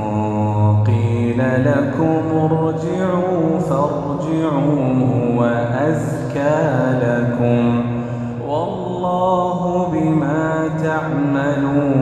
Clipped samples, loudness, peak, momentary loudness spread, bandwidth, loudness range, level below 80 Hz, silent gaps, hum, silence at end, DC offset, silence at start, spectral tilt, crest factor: under 0.1%; -18 LUFS; -2 dBFS; 5 LU; 9.4 kHz; 2 LU; -46 dBFS; none; none; 0 s; under 0.1%; 0 s; -8.5 dB/octave; 14 dB